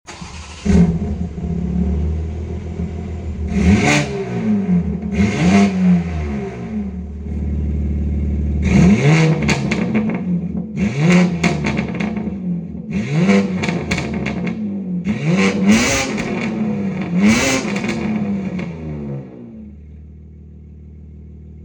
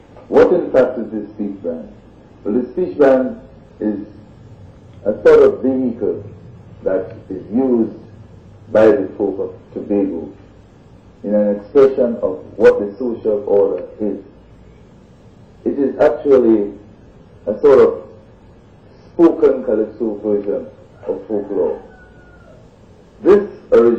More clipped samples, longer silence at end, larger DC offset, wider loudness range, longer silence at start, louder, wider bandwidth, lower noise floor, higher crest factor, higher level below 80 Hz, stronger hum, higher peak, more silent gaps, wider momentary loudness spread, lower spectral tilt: neither; about the same, 0 s vs 0 s; neither; about the same, 4 LU vs 4 LU; second, 0.1 s vs 0.3 s; about the same, -18 LUFS vs -16 LUFS; first, 18 kHz vs 7.2 kHz; second, -38 dBFS vs -44 dBFS; about the same, 16 dB vs 16 dB; first, -28 dBFS vs -48 dBFS; neither; about the same, 0 dBFS vs 0 dBFS; neither; second, 13 LU vs 17 LU; second, -6 dB/octave vs -8.5 dB/octave